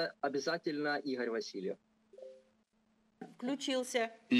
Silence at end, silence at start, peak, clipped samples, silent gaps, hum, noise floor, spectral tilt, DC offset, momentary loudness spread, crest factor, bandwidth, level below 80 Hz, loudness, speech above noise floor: 0 s; 0 s; -18 dBFS; under 0.1%; none; none; -75 dBFS; -3.5 dB/octave; under 0.1%; 19 LU; 18 dB; 14 kHz; -90 dBFS; -37 LUFS; 39 dB